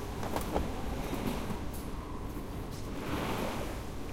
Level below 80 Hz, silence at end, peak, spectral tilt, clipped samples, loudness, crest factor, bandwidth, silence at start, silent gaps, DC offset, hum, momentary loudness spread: -42 dBFS; 0 s; -16 dBFS; -5.5 dB/octave; under 0.1%; -38 LUFS; 20 dB; 16.5 kHz; 0 s; none; under 0.1%; none; 7 LU